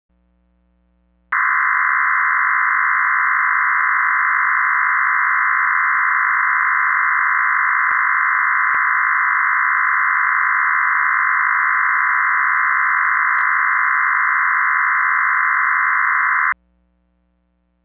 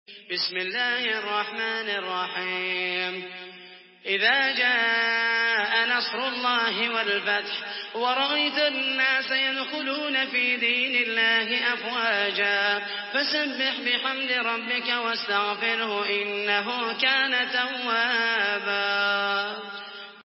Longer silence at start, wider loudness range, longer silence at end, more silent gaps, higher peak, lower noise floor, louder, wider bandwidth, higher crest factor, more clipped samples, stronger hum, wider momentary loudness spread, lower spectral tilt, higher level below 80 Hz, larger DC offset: first, 1.3 s vs 0.1 s; about the same, 1 LU vs 3 LU; first, 1.3 s vs 0.05 s; neither; first, -4 dBFS vs -8 dBFS; first, -64 dBFS vs -48 dBFS; first, -15 LUFS vs -24 LUFS; second, 2.8 kHz vs 5.8 kHz; about the same, 14 dB vs 18 dB; neither; first, 60 Hz at -60 dBFS vs none; second, 0 LU vs 7 LU; second, -3 dB/octave vs -5.5 dB/octave; first, -62 dBFS vs under -90 dBFS; neither